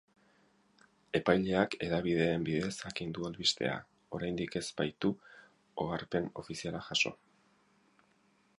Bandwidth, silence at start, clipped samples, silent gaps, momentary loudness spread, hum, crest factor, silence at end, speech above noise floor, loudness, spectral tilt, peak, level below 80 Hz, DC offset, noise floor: 11.5 kHz; 1.15 s; under 0.1%; none; 10 LU; none; 24 dB; 1.45 s; 36 dB; -34 LUFS; -4.5 dB/octave; -12 dBFS; -62 dBFS; under 0.1%; -70 dBFS